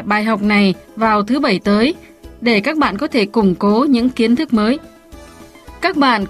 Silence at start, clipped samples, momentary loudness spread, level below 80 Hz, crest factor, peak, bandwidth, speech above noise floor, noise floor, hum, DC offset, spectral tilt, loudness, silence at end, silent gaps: 0 s; under 0.1%; 5 LU; -44 dBFS; 14 dB; -2 dBFS; 13 kHz; 24 dB; -39 dBFS; none; under 0.1%; -6.5 dB/octave; -15 LUFS; 0 s; none